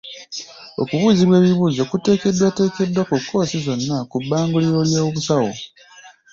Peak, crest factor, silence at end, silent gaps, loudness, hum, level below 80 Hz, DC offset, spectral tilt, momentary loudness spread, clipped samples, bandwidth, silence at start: -4 dBFS; 14 dB; 0.25 s; none; -18 LUFS; none; -54 dBFS; under 0.1%; -6 dB/octave; 17 LU; under 0.1%; 7.6 kHz; 0.05 s